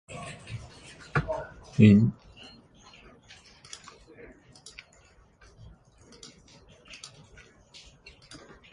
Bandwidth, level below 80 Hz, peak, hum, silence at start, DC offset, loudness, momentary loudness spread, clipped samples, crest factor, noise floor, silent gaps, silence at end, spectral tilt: 10.5 kHz; -54 dBFS; -6 dBFS; none; 0.1 s; under 0.1%; -24 LUFS; 30 LU; under 0.1%; 24 dB; -59 dBFS; none; 6.6 s; -7.5 dB/octave